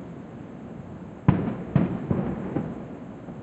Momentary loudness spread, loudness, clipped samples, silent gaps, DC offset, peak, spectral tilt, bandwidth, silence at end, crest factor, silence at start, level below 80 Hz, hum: 16 LU; -27 LUFS; under 0.1%; none; under 0.1%; -4 dBFS; -10.5 dB/octave; 7.8 kHz; 0 s; 24 dB; 0 s; -48 dBFS; none